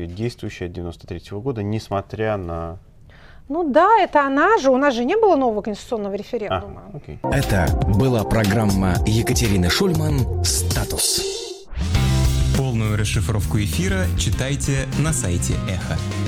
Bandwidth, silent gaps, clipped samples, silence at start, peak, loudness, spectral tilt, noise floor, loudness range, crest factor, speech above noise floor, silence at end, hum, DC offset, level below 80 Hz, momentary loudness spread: 18.5 kHz; none; under 0.1%; 0 s; -4 dBFS; -20 LUFS; -5 dB/octave; -44 dBFS; 4 LU; 16 dB; 24 dB; 0 s; none; under 0.1%; -30 dBFS; 13 LU